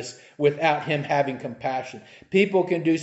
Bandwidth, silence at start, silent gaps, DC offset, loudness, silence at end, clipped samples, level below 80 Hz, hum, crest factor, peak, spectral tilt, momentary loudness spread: 8.2 kHz; 0 s; none; under 0.1%; -24 LUFS; 0 s; under 0.1%; -68 dBFS; none; 18 dB; -6 dBFS; -6 dB/octave; 13 LU